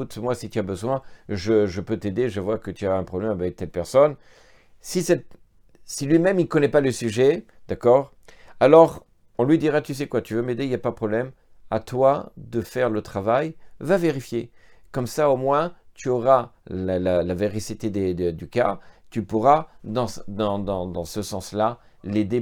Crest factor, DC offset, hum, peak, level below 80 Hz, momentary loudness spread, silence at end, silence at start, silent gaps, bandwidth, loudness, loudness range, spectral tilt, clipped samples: 22 dB; under 0.1%; none; -2 dBFS; -54 dBFS; 12 LU; 0 s; 0 s; none; 19 kHz; -23 LUFS; 5 LU; -6.5 dB/octave; under 0.1%